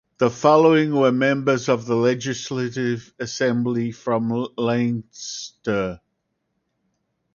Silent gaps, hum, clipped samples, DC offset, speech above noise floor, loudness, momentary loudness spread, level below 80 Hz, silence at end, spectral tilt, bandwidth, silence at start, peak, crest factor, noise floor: none; none; under 0.1%; under 0.1%; 54 dB; -21 LUFS; 13 LU; -58 dBFS; 1.35 s; -5.5 dB/octave; 7.2 kHz; 0.2 s; -2 dBFS; 20 dB; -74 dBFS